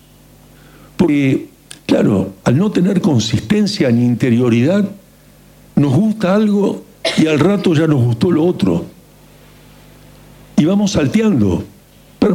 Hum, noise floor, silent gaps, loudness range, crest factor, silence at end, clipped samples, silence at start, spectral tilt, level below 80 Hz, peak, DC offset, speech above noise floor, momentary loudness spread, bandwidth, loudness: none; -45 dBFS; none; 3 LU; 12 dB; 0 s; under 0.1%; 1 s; -7 dB/octave; -44 dBFS; -4 dBFS; under 0.1%; 31 dB; 8 LU; 16 kHz; -14 LUFS